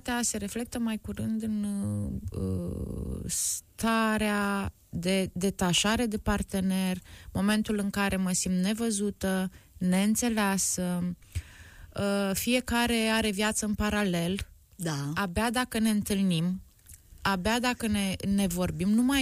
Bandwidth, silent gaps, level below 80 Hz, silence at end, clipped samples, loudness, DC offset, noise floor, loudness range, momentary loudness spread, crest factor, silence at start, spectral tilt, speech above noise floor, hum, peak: 15.5 kHz; none; -48 dBFS; 0 s; under 0.1%; -29 LUFS; under 0.1%; -53 dBFS; 2 LU; 9 LU; 16 dB; 0.05 s; -4 dB/octave; 24 dB; none; -12 dBFS